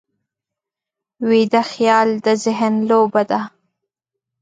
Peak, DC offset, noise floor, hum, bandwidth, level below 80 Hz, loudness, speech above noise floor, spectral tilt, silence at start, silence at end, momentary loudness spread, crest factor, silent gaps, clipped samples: -2 dBFS; under 0.1%; -86 dBFS; none; 9.2 kHz; -70 dBFS; -16 LUFS; 70 dB; -5 dB/octave; 1.2 s; 0.95 s; 8 LU; 16 dB; none; under 0.1%